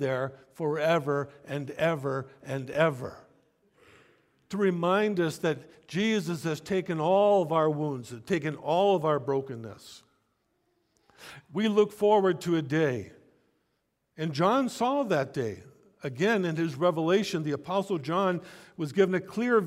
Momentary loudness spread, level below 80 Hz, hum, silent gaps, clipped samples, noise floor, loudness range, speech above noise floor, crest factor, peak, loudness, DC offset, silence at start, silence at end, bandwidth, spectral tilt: 13 LU; -70 dBFS; none; none; under 0.1%; -77 dBFS; 4 LU; 49 dB; 18 dB; -10 dBFS; -28 LUFS; under 0.1%; 0 s; 0 s; 15.5 kHz; -6.5 dB/octave